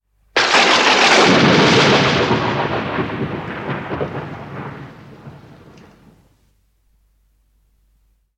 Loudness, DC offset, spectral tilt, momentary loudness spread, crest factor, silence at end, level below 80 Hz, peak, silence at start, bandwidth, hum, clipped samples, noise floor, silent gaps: -14 LUFS; under 0.1%; -4 dB/octave; 20 LU; 18 dB; 3 s; -48 dBFS; 0 dBFS; 0.35 s; 12.5 kHz; none; under 0.1%; -60 dBFS; none